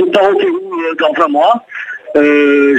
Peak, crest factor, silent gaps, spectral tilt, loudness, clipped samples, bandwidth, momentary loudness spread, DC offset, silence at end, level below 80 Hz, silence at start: 0 dBFS; 10 dB; none; -5 dB/octave; -11 LUFS; under 0.1%; 9 kHz; 9 LU; under 0.1%; 0 s; -60 dBFS; 0 s